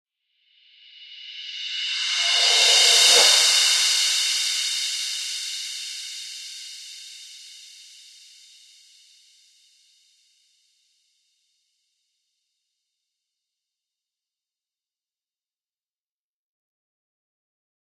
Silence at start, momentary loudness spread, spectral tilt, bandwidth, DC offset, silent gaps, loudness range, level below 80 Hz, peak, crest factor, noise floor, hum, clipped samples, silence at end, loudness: 1 s; 25 LU; 5 dB/octave; 16.5 kHz; under 0.1%; none; 21 LU; under -90 dBFS; -4 dBFS; 22 dB; under -90 dBFS; none; under 0.1%; 10.35 s; -17 LUFS